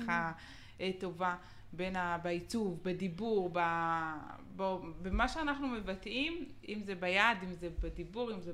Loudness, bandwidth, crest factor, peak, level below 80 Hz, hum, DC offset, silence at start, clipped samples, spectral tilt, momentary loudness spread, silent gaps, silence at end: -37 LUFS; 14 kHz; 24 dB; -14 dBFS; -50 dBFS; none; under 0.1%; 0 s; under 0.1%; -5.5 dB/octave; 11 LU; none; 0 s